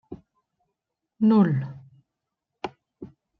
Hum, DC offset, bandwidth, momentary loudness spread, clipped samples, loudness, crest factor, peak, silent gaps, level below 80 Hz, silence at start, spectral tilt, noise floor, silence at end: none; under 0.1%; 5.8 kHz; 24 LU; under 0.1%; -22 LUFS; 18 dB; -8 dBFS; none; -66 dBFS; 0.1 s; -10 dB/octave; -84 dBFS; 0.35 s